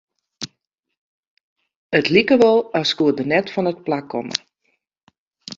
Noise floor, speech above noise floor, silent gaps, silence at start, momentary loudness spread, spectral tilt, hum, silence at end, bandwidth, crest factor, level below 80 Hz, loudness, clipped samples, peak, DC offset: -72 dBFS; 55 dB; 0.97-1.37 s, 1.43-1.56 s, 1.76-1.90 s, 5.03-5.07 s, 5.18-5.31 s; 0.4 s; 19 LU; -5 dB/octave; none; 0.05 s; 7.6 kHz; 20 dB; -62 dBFS; -18 LUFS; under 0.1%; -2 dBFS; under 0.1%